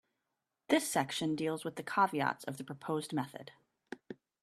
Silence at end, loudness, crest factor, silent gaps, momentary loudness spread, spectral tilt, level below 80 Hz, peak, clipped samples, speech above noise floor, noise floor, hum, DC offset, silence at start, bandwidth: 0.3 s; -35 LUFS; 22 dB; none; 20 LU; -4 dB/octave; -78 dBFS; -14 dBFS; under 0.1%; 52 dB; -87 dBFS; none; under 0.1%; 0.7 s; 14.5 kHz